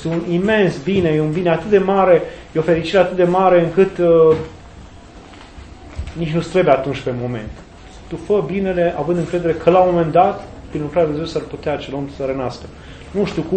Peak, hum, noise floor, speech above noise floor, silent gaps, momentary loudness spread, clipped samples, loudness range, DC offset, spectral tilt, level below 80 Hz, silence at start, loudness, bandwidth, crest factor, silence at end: 0 dBFS; none; -39 dBFS; 23 dB; none; 16 LU; under 0.1%; 7 LU; under 0.1%; -7.5 dB/octave; -40 dBFS; 0 s; -17 LUFS; 8.8 kHz; 18 dB; 0 s